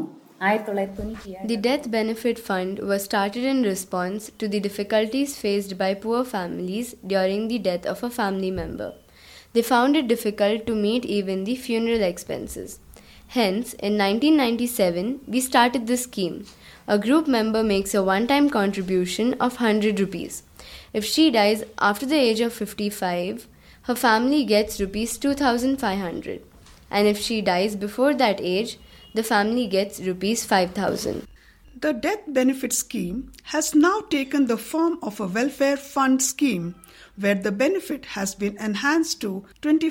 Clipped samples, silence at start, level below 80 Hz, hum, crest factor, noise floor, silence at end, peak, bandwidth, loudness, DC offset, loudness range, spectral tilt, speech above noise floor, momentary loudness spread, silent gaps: under 0.1%; 0 s; -52 dBFS; none; 18 dB; -49 dBFS; 0 s; -4 dBFS; 17 kHz; -23 LUFS; under 0.1%; 3 LU; -4 dB/octave; 26 dB; 11 LU; none